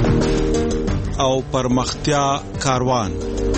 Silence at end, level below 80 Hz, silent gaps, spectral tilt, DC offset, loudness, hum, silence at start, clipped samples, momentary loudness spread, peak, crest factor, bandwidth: 0 s; -28 dBFS; none; -5.5 dB/octave; under 0.1%; -20 LUFS; none; 0 s; under 0.1%; 4 LU; -4 dBFS; 16 dB; 8.8 kHz